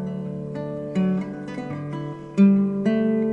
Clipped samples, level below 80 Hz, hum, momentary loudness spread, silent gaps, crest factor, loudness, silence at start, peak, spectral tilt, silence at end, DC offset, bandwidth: under 0.1%; -58 dBFS; none; 14 LU; none; 16 dB; -24 LUFS; 0 s; -6 dBFS; -9.5 dB/octave; 0 s; under 0.1%; 7.2 kHz